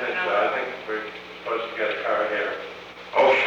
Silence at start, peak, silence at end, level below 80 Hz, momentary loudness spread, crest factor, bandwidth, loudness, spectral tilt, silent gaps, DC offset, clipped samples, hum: 0 s; -8 dBFS; 0 s; -64 dBFS; 13 LU; 16 dB; 8 kHz; -25 LUFS; -4 dB/octave; none; under 0.1%; under 0.1%; 60 Hz at -55 dBFS